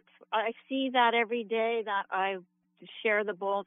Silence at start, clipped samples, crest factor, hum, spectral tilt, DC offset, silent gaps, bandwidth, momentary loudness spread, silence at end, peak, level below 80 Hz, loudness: 0.3 s; under 0.1%; 18 dB; none; -6 dB/octave; under 0.1%; none; 3.9 kHz; 8 LU; 0.05 s; -12 dBFS; under -90 dBFS; -30 LUFS